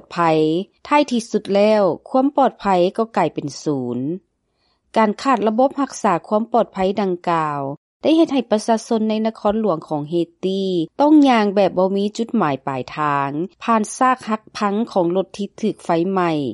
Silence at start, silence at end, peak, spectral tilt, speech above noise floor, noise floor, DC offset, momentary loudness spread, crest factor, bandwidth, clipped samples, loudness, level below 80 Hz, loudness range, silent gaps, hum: 0.1 s; 0 s; -4 dBFS; -6 dB/octave; 48 dB; -66 dBFS; under 0.1%; 8 LU; 14 dB; 11.5 kHz; under 0.1%; -19 LUFS; -58 dBFS; 3 LU; 7.77-8.00 s; none